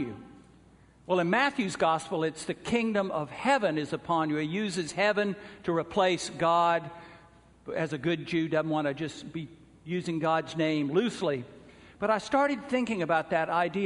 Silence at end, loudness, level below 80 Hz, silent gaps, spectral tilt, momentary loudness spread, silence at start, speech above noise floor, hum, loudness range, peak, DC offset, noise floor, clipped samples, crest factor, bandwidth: 0 s; -29 LUFS; -64 dBFS; none; -5.5 dB/octave; 11 LU; 0 s; 29 dB; none; 3 LU; -10 dBFS; under 0.1%; -58 dBFS; under 0.1%; 18 dB; 10.5 kHz